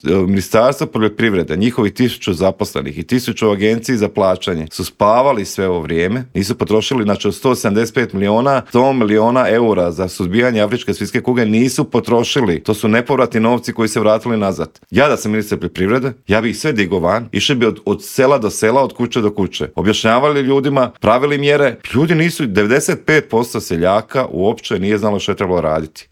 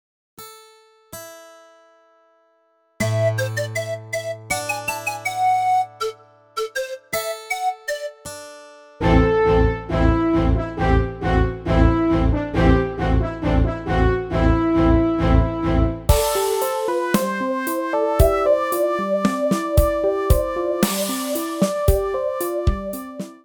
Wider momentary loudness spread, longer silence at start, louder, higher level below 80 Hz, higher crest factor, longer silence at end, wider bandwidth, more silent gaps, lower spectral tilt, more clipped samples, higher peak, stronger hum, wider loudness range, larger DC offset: second, 6 LU vs 12 LU; second, 0.05 s vs 0.4 s; first, -15 LUFS vs -20 LUFS; second, -48 dBFS vs -26 dBFS; about the same, 14 dB vs 18 dB; about the same, 0.1 s vs 0.1 s; second, 17 kHz vs over 20 kHz; neither; about the same, -5.5 dB/octave vs -6 dB/octave; neither; about the same, 0 dBFS vs -2 dBFS; neither; second, 2 LU vs 7 LU; neither